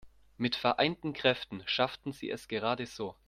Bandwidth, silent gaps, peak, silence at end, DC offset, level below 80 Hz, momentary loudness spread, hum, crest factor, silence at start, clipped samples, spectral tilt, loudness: 15 kHz; none; -10 dBFS; 0.15 s; under 0.1%; -64 dBFS; 10 LU; none; 22 dB; 0.05 s; under 0.1%; -5 dB/octave; -32 LUFS